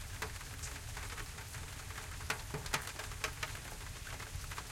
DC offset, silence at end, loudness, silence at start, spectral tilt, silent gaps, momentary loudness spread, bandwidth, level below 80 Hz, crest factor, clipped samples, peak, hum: under 0.1%; 0 s; -43 LUFS; 0 s; -2.5 dB/octave; none; 7 LU; 16.5 kHz; -50 dBFS; 24 dB; under 0.1%; -20 dBFS; none